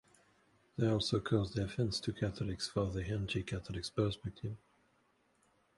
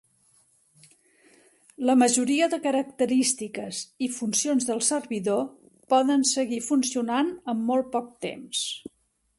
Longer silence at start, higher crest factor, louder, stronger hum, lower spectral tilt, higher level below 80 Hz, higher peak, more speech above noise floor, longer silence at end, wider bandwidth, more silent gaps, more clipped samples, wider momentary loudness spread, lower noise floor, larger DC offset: second, 0.75 s vs 1.8 s; about the same, 20 dB vs 18 dB; second, -37 LUFS vs -25 LUFS; neither; first, -6 dB/octave vs -2.5 dB/octave; first, -54 dBFS vs -72 dBFS; second, -18 dBFS vs -8 dBFS; about the same, 38 dB vs 39 dB; first, 1.2 s vs 0.6 s; about the same, 11.5 kHz vs 12 kHz; neither; neither; about the same, 10 LU vs 11 LU; first, -74 dBFS vs -63 dBFS; neither